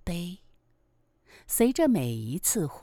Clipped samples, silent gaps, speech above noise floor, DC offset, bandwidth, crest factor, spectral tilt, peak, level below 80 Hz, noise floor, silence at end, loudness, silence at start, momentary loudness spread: under 0.1%; none; 41 dB; under 0.1%; over 20 kHz; 18 dB; -5 dB/octave; -10 dBFS; -50 dBFS; -68 dBFS; 0 s; -26 LUFS; 0.05 s; 12 LU